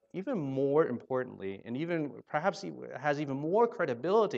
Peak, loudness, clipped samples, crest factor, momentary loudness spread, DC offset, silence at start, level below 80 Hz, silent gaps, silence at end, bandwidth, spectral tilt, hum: -14 dBFS; -32 LUFS; under 0.1%; 18 dB; 10 LU; under 0.1%; 0.15 s; -80 dBFS; none; 0 s; 7.8 kHz; -7 dB/octave; none